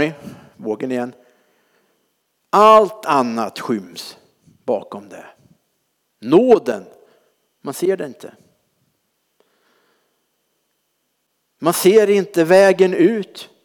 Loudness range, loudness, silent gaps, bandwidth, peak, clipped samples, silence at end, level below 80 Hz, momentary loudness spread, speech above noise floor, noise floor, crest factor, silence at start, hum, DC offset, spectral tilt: 13 LU; -16 LUFS; none; over 20 kHz; -2 dBFS; under 0.1%; 0.2 s; -68 dBFS; 22 LU; 54 dB; -70 dBFS; 16 dB; 0 s; none; under 0.1%; -5 dB/octave